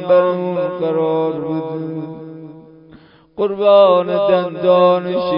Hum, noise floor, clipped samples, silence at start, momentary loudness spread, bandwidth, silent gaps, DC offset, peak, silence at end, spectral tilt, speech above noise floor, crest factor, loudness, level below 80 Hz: none; -45 dBFS; under 0.1%; 0 s; 19 LU; 5.4 kHz; none; under 0.1%; 0 dBFS; 0 s; -11.5 dB/octave; 30 dB; 16 dB; -15 LUFS; -60 dBFS